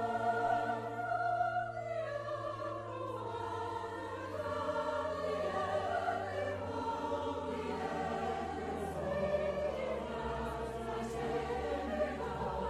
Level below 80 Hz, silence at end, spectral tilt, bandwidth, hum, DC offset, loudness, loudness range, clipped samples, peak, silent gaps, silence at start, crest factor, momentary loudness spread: -56 dBFS; 0 s; -6 dB/octave; 13 kHz; none; under 0.1%; -37 LUFS; 2 LU; under 0.1%; -22 dBFS; none; 0 s; 16 dB; 6 LU